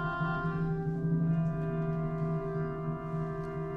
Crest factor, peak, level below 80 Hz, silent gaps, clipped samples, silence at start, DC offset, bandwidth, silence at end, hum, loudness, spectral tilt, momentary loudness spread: 12 dB; -20 dBFS; -50 dBFS; none; under 0.1%; 0 s; under 0.1%; 4.4 kHz; 0 s; none; -33 LUFS; -10 dB/octave; 6 LU